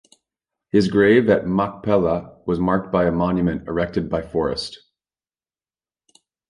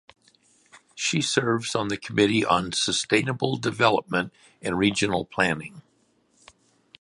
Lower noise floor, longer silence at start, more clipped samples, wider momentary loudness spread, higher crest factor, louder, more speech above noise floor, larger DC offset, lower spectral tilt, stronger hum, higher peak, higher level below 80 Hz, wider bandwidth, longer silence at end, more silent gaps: first, under -90 dBFS vs -66 dBFS; second, 0.75 s vs 0.95 s; neither; first, 10 LU vs 7 LU; about the same, 18 dB vs 22 dB; first, -20 LUFS vs -24 LUFS; first, over 71 dB vs 41 dB; neither; first, -7.5 dB/octave vs -4 dB/octave; neither; about the same, -2 dBFS vs -4 dBFS; first, -44 dBFS vs -56 dBFS; about the same, 11 kHz vs 11.5 kHz; first, 1.75 s vs 1.2 s; neither